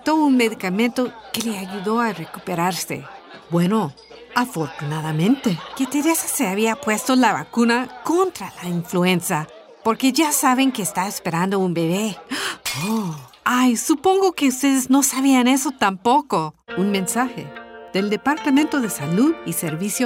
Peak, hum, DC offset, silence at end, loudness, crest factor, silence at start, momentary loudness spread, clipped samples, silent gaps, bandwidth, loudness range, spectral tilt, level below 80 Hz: -2 dBFS; none; under 0.1%; 0 s; -20 LUFS; 18 dB; 0.05 s; 9 LU; under 0.1%; none; 16 kHz; 5 LU; -4 dB/octave; -62 dBFS